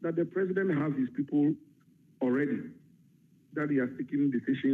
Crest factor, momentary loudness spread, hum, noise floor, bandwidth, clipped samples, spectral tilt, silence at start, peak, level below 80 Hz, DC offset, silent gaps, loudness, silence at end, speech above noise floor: 14 dB; 8 LU; none; -63 dBFS; 3.9 kHz; under 0.1%; -9.5 dB/octave; 0 s; -18 dBFS; -80 dBFS; under 0.1%; none; -31 LUFS; 0 s; 33 dB